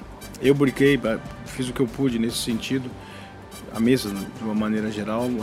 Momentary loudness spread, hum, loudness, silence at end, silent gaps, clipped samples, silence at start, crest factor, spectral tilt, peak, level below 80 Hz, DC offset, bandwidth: 19 LU; none; -23 LUFS; 0 s; none; under 0.1%; 0 s; 18 dB; -5.5 dB/octave; -6 dBFS; -48 dBFS; under 0.1%; 16 kHz